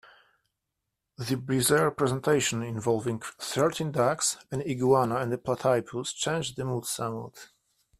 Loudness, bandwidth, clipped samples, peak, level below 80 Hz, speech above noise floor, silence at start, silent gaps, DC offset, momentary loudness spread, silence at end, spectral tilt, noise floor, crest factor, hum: -28 LUFS; 15.5 kHz; under 0.1%; -10 dBFS; -62 dBFS; 56 dB; 1.2 s; none; under 0.1%; 10 LU; 0.55 s; -4.5 dB/octave; -84 dBFS; 20 dB; none